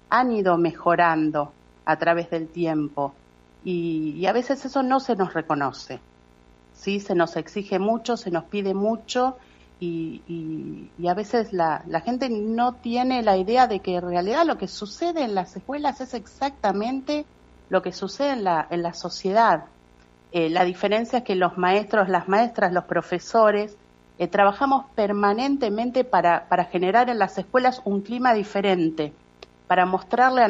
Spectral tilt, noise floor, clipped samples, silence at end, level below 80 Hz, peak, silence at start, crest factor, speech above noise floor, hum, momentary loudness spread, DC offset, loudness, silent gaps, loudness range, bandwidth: -6 dB/octave; -54 dBFS; under 0.1%; 0 s; -58 dBFS; -4 dBFS; 0.1 s; 18 dB; 32 dB; 60 Hz at -55 dBFS; 11 LU; under 0.1%; -23 LUFS; none; 5 LU; 7.8 kHz